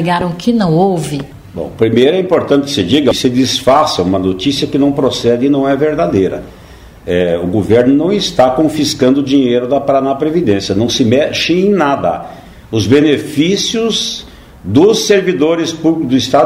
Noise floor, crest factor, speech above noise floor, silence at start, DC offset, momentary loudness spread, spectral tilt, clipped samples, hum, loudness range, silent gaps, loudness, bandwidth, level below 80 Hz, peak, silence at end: -35 dBFS; 12 dB; 24 dB; 0 s; under 0.1%; 8 LU; -5 dB/octave; under 0.1%; none; 2 LU; none; -12 LUFS; 16 kHz; -42 dBFS; 0 dBFS; 0 s